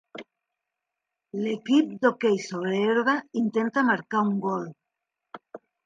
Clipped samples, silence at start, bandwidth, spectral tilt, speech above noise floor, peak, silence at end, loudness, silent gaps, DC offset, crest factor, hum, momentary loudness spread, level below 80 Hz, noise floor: under 0.1%; 0.15 s; 9.2 kHz; -6 dB/octave; 61 dB; -8 dBFS; 0.3 s; -25 LUFS; none; under 0.1%; 18 dB; none; 18 LU; -78 dBFS; -85 dBFS